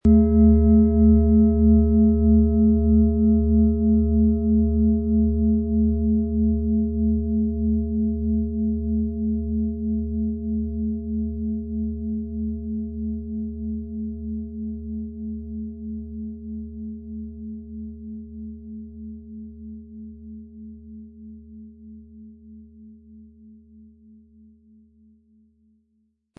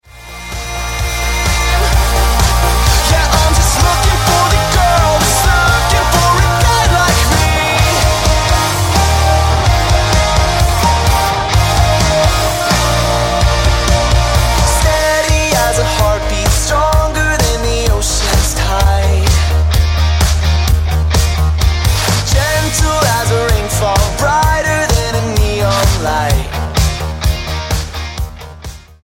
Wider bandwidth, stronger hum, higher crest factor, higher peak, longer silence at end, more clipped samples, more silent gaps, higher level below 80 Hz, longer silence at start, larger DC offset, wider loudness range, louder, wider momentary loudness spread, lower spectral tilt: second, 1.4 kHz vs 17 kHz; neither; about the same, 16 dB vs 12 dB; second, -6 dBFS vs 0 dBFS; first, 3.15 s vs 0.25 s; neither; neither; second, -30 dBFS vs -16 dBFS; about the same, 0.05 s vs 0.15 s; neither; first, 22 LU vs 3 LU; second, -21 LUFS vs -12 LUFS; first, 22 LU vs 6 LU; first, -14.5 dB/octave vs -4 dB/octave